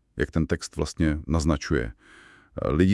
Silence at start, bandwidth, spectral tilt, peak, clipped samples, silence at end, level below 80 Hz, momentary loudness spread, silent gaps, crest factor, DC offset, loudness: 0.15 s; 12 kHz; -6.5 dB/octave; -8 dBFS; under 0.1%; 0 s; -38 dBFS; 7 LU; none; 18 dB; under 0.1%; -27 LUFS